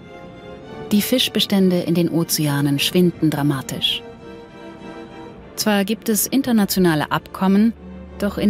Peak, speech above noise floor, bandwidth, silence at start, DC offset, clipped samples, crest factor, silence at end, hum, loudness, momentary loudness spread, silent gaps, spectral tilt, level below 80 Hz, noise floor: -4 dBFS; 20 dB; 16 kHz; 0 s; under 0.1%; under 0.1%; 14 dB; 0 s; none; -18 LUFS; 21 LU; none; -4.5 dB/octave; -48 dBFS; -38 dBFS